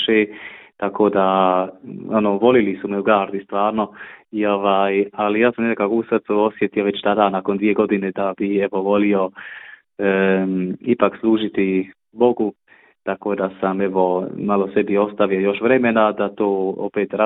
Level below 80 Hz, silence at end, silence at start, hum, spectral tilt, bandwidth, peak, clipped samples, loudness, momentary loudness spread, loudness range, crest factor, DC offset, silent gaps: -60 dBFS; 0 s; 0 s; none; -11 dB/octave; 4 kHz; -2 dBFS; under 0.1%; -19 LUFS; 9 LU; 2 LU; 18 dB; under 0.1%; none